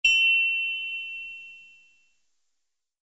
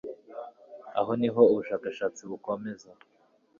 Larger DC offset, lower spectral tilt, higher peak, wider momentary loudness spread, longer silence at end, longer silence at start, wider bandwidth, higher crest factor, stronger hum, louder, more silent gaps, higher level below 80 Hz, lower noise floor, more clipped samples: neither; second, 4 dB/octave vs -6.5 dB/octave; second, -10 dBFS vs -6 dBFS; about the same, 22 LU vs 22 LU; first, 1.45 s vs 0.65 s; about the same, 0.05 s vs 0.05 s; about the same, 8 kHz vs 7.4 kHz; about the same, 18 dB vs 22 dB; neither; first, -22 LUFS vs -28 LUFS; neither; first, -64 dBFS vs -70 dBFS; first, -81 dBFS vs -47 dBFS; neither